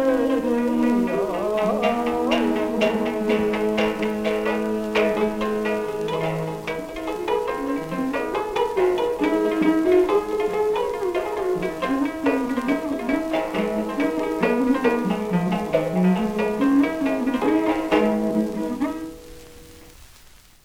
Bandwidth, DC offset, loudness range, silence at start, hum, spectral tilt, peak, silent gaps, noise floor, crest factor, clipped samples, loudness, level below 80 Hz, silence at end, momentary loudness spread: 17 kHz; under 0.1%; 3 LU; 0 s; none; -6.5 dB/octave; -6 dBFS; none; -49 dBFS; 16 dB; under 0.1%; -22 LUFS; -48 dBFS; 0.6 s; 6 LU